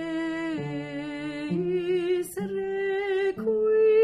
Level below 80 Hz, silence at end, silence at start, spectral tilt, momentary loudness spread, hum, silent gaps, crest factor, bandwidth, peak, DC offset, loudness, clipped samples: -62 dBFS; 0 s; 0 s; -6.5 dB/octave; 10 LU; none; none; 12 dB; 15 kHz; -14 dBFS; under 0.1%; -27 LUFS; under 0.1%